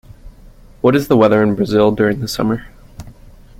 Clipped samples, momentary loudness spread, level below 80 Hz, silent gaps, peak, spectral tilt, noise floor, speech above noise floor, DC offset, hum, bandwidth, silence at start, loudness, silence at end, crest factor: under 0.1%; 7 LU; -40 dBFS; none; 0 dBFS; -6.5 dB/octave; -41 dBFS; 27 dB; under 0.1%; none; 16.5 kHz; 0.25 s; -15 LUFS; 0.5 s; 16 dB